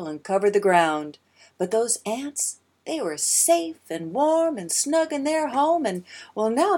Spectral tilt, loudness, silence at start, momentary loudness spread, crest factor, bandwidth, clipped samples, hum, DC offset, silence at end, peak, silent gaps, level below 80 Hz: -3 dB/octave; -23 LUFS; 0 s; 13 LU; 20 dB; 18.5 kHz; under 0.1%; none; under 0.1%; 0 s; -4 dBFS; none; -78 dBFS